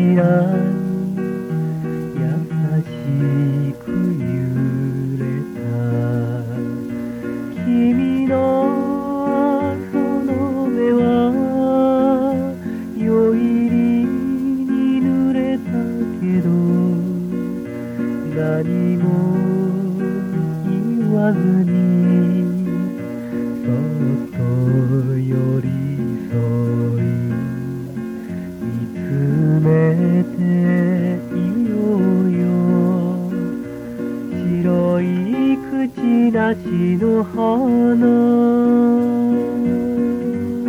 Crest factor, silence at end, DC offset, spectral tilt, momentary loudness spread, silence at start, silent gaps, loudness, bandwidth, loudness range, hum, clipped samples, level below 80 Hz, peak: 14 dB; 0 s; under 0.1%; -9.5 dB/octave; 9 LU; 0 s; none; -18 LUFS; 14.5 kHz; 5 LU; none; under 0.1%; -52 dBFS; -4 dBFS